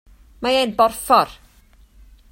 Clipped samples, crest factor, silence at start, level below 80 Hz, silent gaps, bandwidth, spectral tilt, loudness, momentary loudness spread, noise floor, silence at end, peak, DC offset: under 0.1%; 20 dB; 0.4 s; -48 dBFS; none; 16.5 kHz; -3 dB/octave; -18 LUFS; 10 LU; -51 dBFS; 1 s; -2 dBFS; under 0.1%